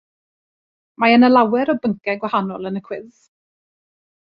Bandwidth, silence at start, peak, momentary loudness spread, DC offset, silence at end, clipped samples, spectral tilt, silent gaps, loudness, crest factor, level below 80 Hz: 5.4 kHz; 1 s; -2 dBFS; 16 LU; under 0.1%; 1.25 s; under 0.1%; -8 dB/octave; none; -17 LUFS; 18 dB; -64 dBFS